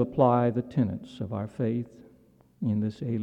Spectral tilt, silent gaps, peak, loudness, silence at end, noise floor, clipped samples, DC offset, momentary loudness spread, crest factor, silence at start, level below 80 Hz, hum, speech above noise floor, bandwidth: -10 dB/octave; none; -8 dBFS; -28 LUFS; 0 s; -59 dBFS; under 0.1%; under 0.1%; 12 LU; 20 dB; 0 s; -62 dBFS; none; 32 dB; 8.2 kHz